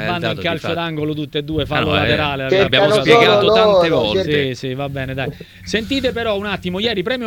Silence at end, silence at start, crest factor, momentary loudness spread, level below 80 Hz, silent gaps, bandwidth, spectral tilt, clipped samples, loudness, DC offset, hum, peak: 0 s; 0 s; 16 dB; 12 LU; -40 dBFS; none; 18 kHz; -5.5 dB/octave; under 0.1%; -16 LUFS; under 0.1%; none; 0 dBFS